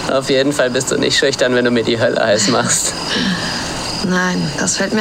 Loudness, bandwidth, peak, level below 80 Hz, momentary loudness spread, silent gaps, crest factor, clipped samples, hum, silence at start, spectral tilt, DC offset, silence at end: -15 LUFS; 16.5 kHz; 0 dBFS; -42 dBFS; 5 LU; none; 14 dB; under 0.1%; none; 0 s; -3 dB/octave; under 0.1%; 0 s